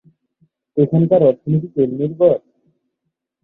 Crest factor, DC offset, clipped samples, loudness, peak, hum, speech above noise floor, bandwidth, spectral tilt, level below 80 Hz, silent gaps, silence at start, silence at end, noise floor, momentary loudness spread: 16 dB; under 0.1%; under 0.1%; -16 LUFS; -2 dBFS; none; 62 dB; 3.9 kHz; -13 dB/octave; -56 dBFS; none; 0.75 s; 1.05 s; -76 dBFS; 7 LU